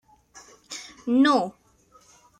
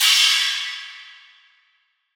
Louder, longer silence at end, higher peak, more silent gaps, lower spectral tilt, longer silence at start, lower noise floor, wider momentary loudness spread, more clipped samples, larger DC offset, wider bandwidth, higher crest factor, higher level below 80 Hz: second, -23 LUFS vs -17 LUFS; second, 0.9 s vs 1.05 s; second, -8 dBFS vs -4 dBFS; neither; first, -4 dB/octave vs 10 dB/octave; first, 0.35 s vs 0 s; second, -58 dBFS vs -66 dBFS; second, 19 LU vs 24 LU; neither; neither; second, 10.5 kHz vs over 20 kHz; about the same, 18 dB vs 18 dB; first, -68 dBFS vs under -90 dBFS